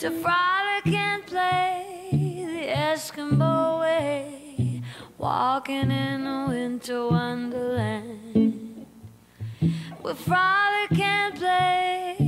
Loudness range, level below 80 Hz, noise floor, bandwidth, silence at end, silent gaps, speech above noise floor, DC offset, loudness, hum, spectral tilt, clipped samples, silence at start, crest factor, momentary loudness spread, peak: 3 LU; -56 dBFS; -48 dBFS; 16 kHz; 0 s; none; 24 dB; under 0.1%; -25 LUFS; none; -6 dB/octave; under 0.1%; 0 s; 16 dB; 11 LU; -10 dBFS